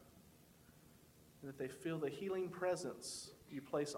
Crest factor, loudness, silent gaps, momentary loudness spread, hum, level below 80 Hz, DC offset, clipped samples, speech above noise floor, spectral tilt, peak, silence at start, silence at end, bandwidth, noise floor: 18 dB; -44 LUFS; none; 24 LU; none; -76 dBFS; under 0.1%; under 0.1%; 22 dB; -4.5 dB/octave; -28 dBFS; 0 s; 0 s; 17 kHz; -66 dBFS